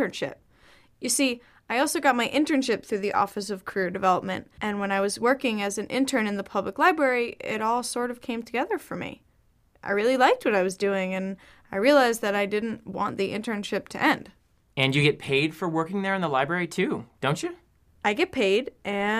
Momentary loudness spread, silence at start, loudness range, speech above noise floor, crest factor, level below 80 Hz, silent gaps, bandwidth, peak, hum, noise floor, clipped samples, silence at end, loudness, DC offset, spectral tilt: 10 LU; 0 s; 2 LU; 38 dB; 20 dB; -62 dBFS; none; 15.5 kHz; -6 dBFS; none; -63 dBFS; under 0.1%; 0 s; -25 LUFS; under 0.1%; -4 dB/octave